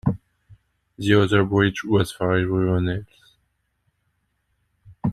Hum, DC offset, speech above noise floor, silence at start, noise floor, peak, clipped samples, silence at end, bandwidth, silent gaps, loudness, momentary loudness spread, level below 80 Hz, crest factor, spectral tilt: none; under 0.1%; 51 dB; 0.05 s; -71 dBFS; -4 dBFS; under 0.1%; 0 s; 13.5 kHz; none; -21 LUFS; 11 LU; -48 dBFS; 20 dB; -7 dB/octave